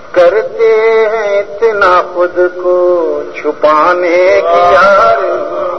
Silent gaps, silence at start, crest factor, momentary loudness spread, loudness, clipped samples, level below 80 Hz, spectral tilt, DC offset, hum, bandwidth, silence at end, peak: none; 0 s; 10 dB; 8 LU; -9 LUFS; 0.5%; -46 dBFS; -5 dB/octave; 2%; none; 6.4 kHz; 0 s; 0 dBFS